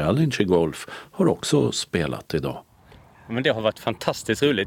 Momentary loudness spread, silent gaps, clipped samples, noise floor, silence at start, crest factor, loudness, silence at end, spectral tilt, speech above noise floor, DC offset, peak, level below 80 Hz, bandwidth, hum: 11 LU; none; under 0.1%; -51 dBFS; 0 s; 18 dB; -23 LUFS; 0 s; -5 dB/octave; 28 dB; under 0.1%; -6 dBFS; -50 dBFS; 17.5 kHz; none